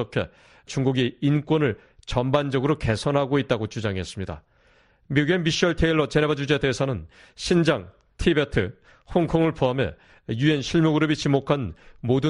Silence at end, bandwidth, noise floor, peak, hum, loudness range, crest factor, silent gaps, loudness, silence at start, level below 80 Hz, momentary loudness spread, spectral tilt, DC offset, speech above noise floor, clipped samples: 0 s; 11 kHz; -59 dBFS; -6 dBFS; none; 2 LU; 18 dB; none; -23 LUFS; 0 s; -42 dBFS; 12 LU; -6 dB/octave; under 0.1%; 36 dB; under 0.1%